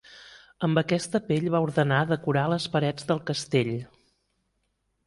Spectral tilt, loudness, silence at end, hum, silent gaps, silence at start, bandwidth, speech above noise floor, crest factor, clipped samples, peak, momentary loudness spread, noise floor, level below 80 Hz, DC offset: -6 dB/octave; -26 LUFS; 1.2 s; none; none; 0.1 s; 11.5 kHz; 50 dB; 18 dB; under 0.1%; -8 dBFS; 6 LU; -75 dBFS; -62 dBFS; under 0.1%